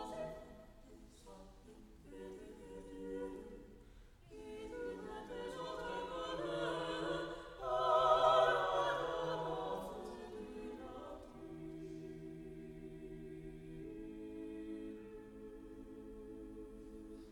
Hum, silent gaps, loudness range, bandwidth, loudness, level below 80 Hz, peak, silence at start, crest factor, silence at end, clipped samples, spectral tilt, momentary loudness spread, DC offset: none; none; 17 LU; 16 kHz; -40 LUFS; -62 dBFS; -18 dBFS; 0 s; 24 dB; 0 s; under 0.1%; -5 dB/octave; 23 LU; under 0.1%